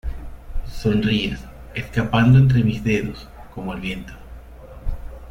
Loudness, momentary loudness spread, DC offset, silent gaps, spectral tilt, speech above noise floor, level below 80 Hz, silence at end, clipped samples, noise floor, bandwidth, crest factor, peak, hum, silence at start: -20 LUFS; 24 LU; under 0.1%; none; -7.5 dB/octave; 21 dB; -34 dBFS; 0 s; under 0.1%; -39 dBFS; 10.5 kHz; 16 dB; -4 dBFS; none; 0.05 s